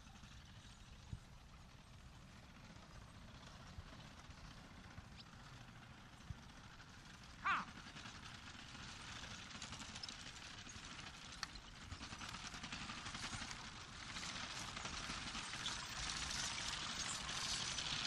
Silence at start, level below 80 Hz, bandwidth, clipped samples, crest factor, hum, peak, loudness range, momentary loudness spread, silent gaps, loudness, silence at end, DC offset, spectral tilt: 0 s; -62 dBFS; 13 kHz; under 0.1%; 22 dB; none; -28 dBFS; 14 LU; 17 LU; none; -47 LUFS; 0 s; under 0.1%; -1.5 dB/octave